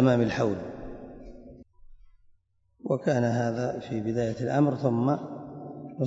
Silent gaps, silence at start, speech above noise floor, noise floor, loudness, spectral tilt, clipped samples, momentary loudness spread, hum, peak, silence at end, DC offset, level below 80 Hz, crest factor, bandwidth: none; 0 s; 40 dB; -66 dBFS; -27 LUFS; -8 dB/octave; under 0.1%; 19 LU; none; -8 dBFS; 0 s; under 0.1%; -54 dBFS; 20 dB; 7.8 kHz